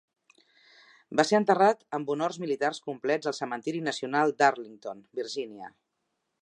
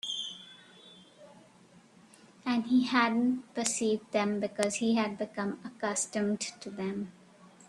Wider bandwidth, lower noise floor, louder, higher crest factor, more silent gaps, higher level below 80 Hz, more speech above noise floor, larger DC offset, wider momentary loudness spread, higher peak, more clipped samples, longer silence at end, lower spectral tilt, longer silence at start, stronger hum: second, 10.5 kHz vs 12.5 kHz; first, -80 dBFS vs -59 dBFS; first, -28 LUFS vs -31 LUFS; about the same, 22 dB vs 22 dB; neither; second, -82 dBFS vs -76 dBFS; first, 53 dB vs 28 dB; neither; first, 16 LU vs 13 LU; about the same, -8 dBFS vs -10 dBFS; neither; first, 0.75 s vs 0.2 s; about the same, -4.5 dB/octave vs -3.5 dB/octave; first, 1.1 s vs 0.05 s; neither